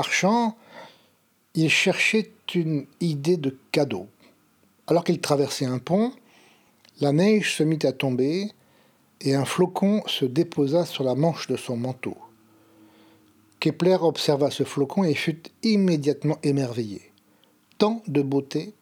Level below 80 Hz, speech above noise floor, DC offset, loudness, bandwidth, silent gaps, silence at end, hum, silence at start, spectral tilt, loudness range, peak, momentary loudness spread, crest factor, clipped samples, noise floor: -74 dBFS; 41 dB; under 0.1%; -24 LUFS; 17.5 kHz; none; 0.1 s; none; 0 s; -5.5 dB/octave; 3 LU; -6 dBFS; 9 LU; 20 dB; under 0.1%; -64 dBFS